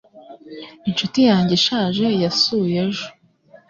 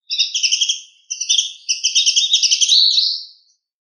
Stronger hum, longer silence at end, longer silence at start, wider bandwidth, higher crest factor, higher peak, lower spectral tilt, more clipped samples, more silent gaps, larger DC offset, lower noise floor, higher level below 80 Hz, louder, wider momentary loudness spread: neither; about the same, 0.6 s vs 0.55 s; about the same, 0.15 s vs 0.1 s; second, 7.6 kHz vs 10.5 kHz; about the same, 16 dB vs 16 dB; second, -4 dBFS vs 0 dBFS; first, -5 dB/octave vs 14.5 dB/octave; neither; neither; neither; about the same, -50 dBFS vs -52 dBFS; first, -56 dBFS vs under -90 dBFS; second, -18 LUFS vs -13 LUFS; first, 20 LU vs 14 LU